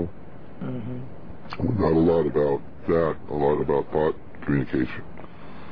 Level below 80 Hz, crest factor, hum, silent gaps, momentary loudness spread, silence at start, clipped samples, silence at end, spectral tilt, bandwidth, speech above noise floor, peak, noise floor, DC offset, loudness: -46 dBFS; 14 dB; none; none; 22 LU; 0 s; under 0.1%; 0 s; -10.5 dB/octave; 5.4 kHz; 21 dB; -10 dBFS; -44 dBFS; 2%; -25 LUFS